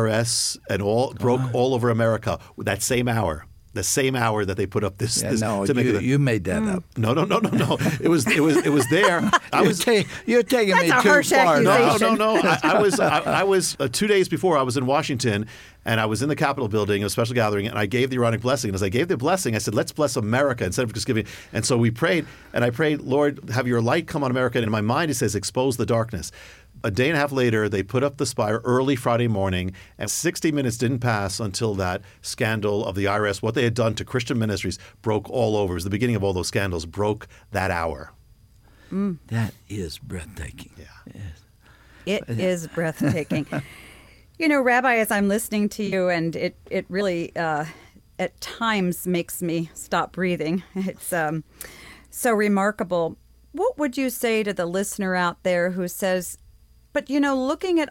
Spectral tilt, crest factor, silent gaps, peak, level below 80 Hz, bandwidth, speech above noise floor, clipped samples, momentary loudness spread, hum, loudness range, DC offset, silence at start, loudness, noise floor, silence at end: -5 dB/octave; 16 dB; none; -6 dBFS; -50 dBFS; 17 kHz; 31 dB; under 0.1%; 11 LU; none; 9 LU; under 0.1%; 0 s; -22 LUFS; -53 dBFS; 0.05 s